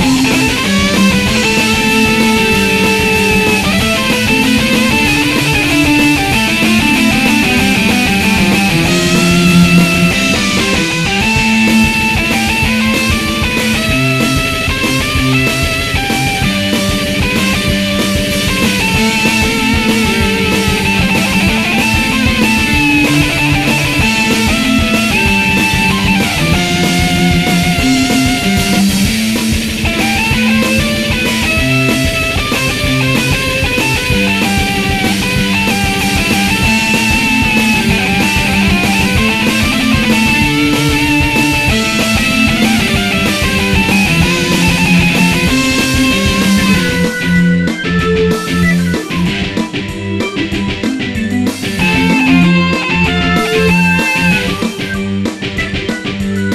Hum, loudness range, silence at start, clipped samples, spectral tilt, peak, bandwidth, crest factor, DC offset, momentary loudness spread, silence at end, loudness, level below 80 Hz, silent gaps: none; 3 LU; 0 s; under 0.1%; -4 dB/octave; 0 dBFS; 16 kHz; 12 dB; under 0.1%; 4 LU; 0 s; -11 LUFS; -26 dBFS; none